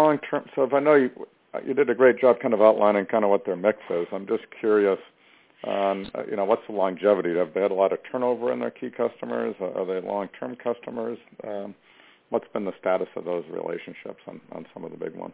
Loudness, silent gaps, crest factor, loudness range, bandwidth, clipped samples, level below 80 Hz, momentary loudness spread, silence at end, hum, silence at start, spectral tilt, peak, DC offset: -24 LUFS; none; 22 dB; 10 LU; 4 kHz; under 0.1%; -70 dBFS; 17 LU; 0 s; none; 0 s; -10 dB/octave; -2 dBFS; under 0.1%